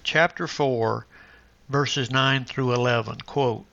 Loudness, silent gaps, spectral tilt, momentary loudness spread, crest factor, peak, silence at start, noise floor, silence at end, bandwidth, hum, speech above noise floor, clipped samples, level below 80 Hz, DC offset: -24 LUFS; none; -5 dB/octave; 6 LU; 20 dB; -4 dBFS; 0.05 s; -52 dBFS; 0.1 s; 7.6 kHz; none; 29 dB; under 0.1%; -58 dBFS; under 0.1%